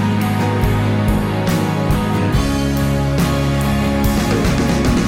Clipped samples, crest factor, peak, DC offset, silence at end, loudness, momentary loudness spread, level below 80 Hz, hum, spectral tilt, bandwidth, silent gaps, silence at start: under 0.1%; 12 dB; -4 dBFS; under 0.1%; 0 s; -17 LUFS; 2 LU; -24 dBFS; none; -6 dB/octave; 16.5 kHz; none; 0 s